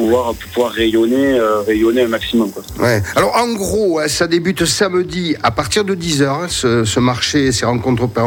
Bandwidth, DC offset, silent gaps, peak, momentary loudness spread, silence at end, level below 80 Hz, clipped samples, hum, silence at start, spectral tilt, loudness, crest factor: 18 kHz; under 0.1%; none; 0 dBFS; 4 LU; 0 s; -38 dBFS; under 0.1%; none; 0 s; -4.5 dB/octave; -15 LUFS; 14 dB